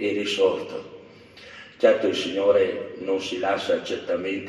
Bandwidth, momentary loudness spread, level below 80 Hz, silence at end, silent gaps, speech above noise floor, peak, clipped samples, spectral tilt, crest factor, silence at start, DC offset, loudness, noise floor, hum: 11.5 kHz; 18 LU; -70 dBFS; 0 s; none; 23 dB; -6 dBFS; under 0.1%; -4 dB/octave; 20 dB; 0 s; under 0.1%; -23 LUFS; -47 dBFS; none